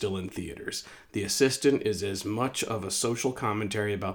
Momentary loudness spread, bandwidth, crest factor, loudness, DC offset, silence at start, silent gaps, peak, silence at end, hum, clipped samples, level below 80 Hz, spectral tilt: 11 LU; over 20 kHz; 20 dB; -29 LUFS; under 0.1%; 0 s; none; -10 dBFS; 0 s; none; under 0.1%; -60 dBFS; -4 dB/octave